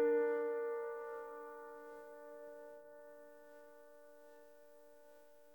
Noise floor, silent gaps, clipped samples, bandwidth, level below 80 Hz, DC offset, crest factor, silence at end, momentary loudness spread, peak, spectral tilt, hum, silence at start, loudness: -64 dBFS; none; under 0.1%; 19 kHz; under -90 dBFS; under 0.1%; 18 dB; 0 s; 24 LU; -26 dBFS; -5.5 dB/octave; none; 0 s; -43 LUFS